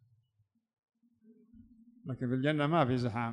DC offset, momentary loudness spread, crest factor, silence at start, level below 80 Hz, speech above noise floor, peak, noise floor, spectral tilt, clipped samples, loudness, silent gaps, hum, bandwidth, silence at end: under 0.1%; 14 LU; 20 dB; 1.55 s; -68 dBFS; 46 dB; -16 dBFS; -77 dBFS; -8 dB/octave; under 0.1%; -31 LUFS; none; none; 10 kHz; 0 s